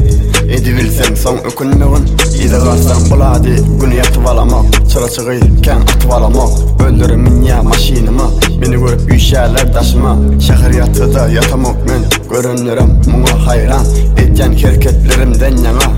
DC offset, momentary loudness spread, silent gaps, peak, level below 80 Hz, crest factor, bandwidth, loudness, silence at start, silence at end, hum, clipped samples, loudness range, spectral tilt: 0.8%; 3 LU; none; 0 dBFS; -10 dBFS; 8 dB; 16.5 kHz; -10 LUFS; 0 s; 0 s; none; under 0.1%; 1 LU; -5.5 dB/octave